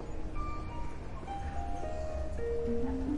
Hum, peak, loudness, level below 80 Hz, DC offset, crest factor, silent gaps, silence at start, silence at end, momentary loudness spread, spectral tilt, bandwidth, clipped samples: none; -22 dBFS; -39 LUFS; -40 dBFS; under 0.1%; 14 dB; none; 0 s; 0 s; 8 LU; -7.5 dB/octave; 10.5 kHz; under 0.1%